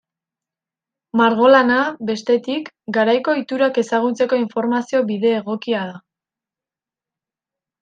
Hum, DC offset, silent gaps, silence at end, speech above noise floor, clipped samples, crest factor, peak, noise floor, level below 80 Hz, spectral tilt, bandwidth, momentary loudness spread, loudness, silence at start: none; under 0.1%; none; 1.85 s; 72 dB; under 0.1%; 18 dB; -2 dBFS; -89 dBFS; -68 dBFS; -5.5 dB/octave; 8.8 kHz; 11 LU; -18 LUFS; 1.15 s